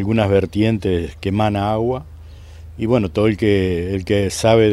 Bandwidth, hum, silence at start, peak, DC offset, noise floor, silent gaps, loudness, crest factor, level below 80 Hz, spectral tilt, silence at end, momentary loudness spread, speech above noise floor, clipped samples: 13 kHz; none; 0 s; 0 dBFS; under 0.1%; -37 dBFS; none; -18 LUFS; 16 dB; -40 dBFS; -6.5 dB/octave; 0 s; 7 LU; 20 dB; under 0.1%